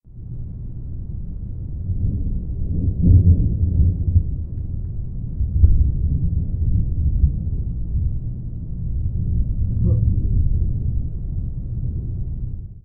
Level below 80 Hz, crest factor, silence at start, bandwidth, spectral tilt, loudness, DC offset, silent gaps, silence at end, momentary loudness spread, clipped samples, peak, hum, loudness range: -24 dBFS; 20 dB; 0.05 s; 0.9 kHz; -16 dB/octave; -22 LUFS; under 0.1%; none; 0.05 s; 14 LU; under 0.1%; 0 dBFS; none; 4 LU